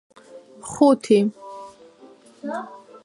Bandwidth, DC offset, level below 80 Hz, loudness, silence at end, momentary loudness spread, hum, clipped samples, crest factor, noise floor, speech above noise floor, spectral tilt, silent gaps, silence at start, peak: 11.5 kHz; under 0.1%; -66 dBFS; -20 LUFS; 0.3 s; 22 LU; none; under 0.1%; 20 dB; -49 dBFS; 30 dB; -6 dB/octave; none; 0.35 s; -4 dBFS